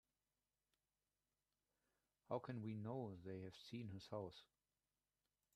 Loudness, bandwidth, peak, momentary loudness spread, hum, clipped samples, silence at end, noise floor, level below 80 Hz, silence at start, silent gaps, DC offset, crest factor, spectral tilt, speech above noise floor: -52 LUFS; 13 kHz; -32 dBFS; 6 LU; 50 Hz at -80 dBFS; under 0.1%; 1.1 s; under -90 dBFS; -86 dBFS; 2.3 s; none; under 0.1%; 24 dB; -7.5 dB/octave; over 39 dB